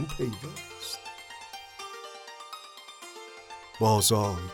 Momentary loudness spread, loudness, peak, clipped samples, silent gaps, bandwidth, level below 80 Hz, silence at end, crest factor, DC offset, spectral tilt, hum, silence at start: 22 LU; -28 LUFS; -10 dBFS; under 0.1%; none; 17 kHz; -54 dBFS; 0 s; 22 dB; under 0.1%; -4 dB/octave; none; 0 s